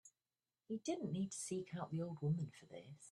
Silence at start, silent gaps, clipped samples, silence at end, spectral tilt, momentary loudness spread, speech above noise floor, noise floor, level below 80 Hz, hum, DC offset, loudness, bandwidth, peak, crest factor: 0.05 s; none; under 0.1%; 0 s; -6 dB/octave; 13 LU; over 46 dB; under -90 dBFS; -82 dBFS; none; under 0.1%; -44 LUFS; 12.5 kHz; -30 dBFS; 16 dB